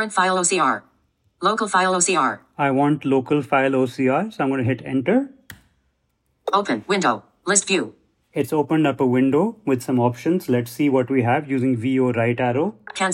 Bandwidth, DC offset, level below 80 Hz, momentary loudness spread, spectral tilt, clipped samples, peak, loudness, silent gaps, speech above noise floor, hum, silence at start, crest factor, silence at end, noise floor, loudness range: 16 kHz; under 0.1%; -66 dBFS; 6 LU; -4.5 dB/octave; under 0.1%; -2 dBFS; -20 LUFS; none; 49 dB; none; 0 s; 18 dB; 0 s; -69 dBFS; 3 LU